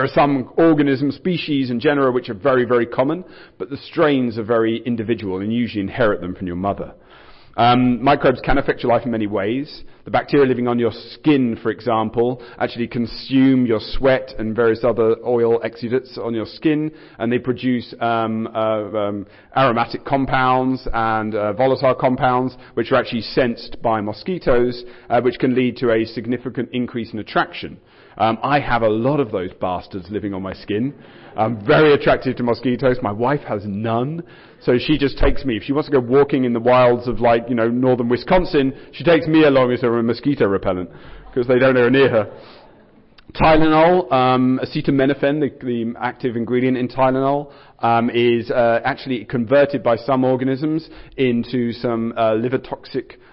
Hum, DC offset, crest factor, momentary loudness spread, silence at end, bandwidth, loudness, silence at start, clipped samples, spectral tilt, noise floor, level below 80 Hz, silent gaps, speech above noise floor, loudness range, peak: none; under 0.1%; 14 dB; 10 LU; 0.3 s; 5.8 kHz; -18 LUFS; 0 s; under 0.1%; -11.5 dB/octave; -49 dBFS; -38 dBFS; none; 31 dB; 4 LU; -4 dBFS